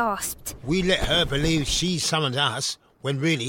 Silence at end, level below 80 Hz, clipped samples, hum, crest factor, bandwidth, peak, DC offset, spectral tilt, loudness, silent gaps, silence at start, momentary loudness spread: 0 s; -38 dBFS; under 0.1%; none; 16 dB; 16.5 kHz; -8 dBFS; under 0.1%; -3.5 dB/octave; -24 LUFS; none; 0 s; 9 LU